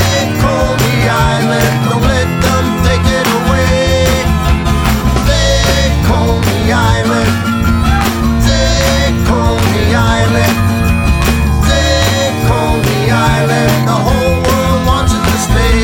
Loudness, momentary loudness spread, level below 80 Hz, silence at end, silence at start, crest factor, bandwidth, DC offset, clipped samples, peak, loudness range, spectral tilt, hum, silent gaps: -11 LUFS; 2 LU; -16 dBFS; 0 s; 0 s; 10 dB; over 20 kHz; under 0.1%; under 0.1%; 0 dBFS; 0 LU; -5 dB/octave; none; none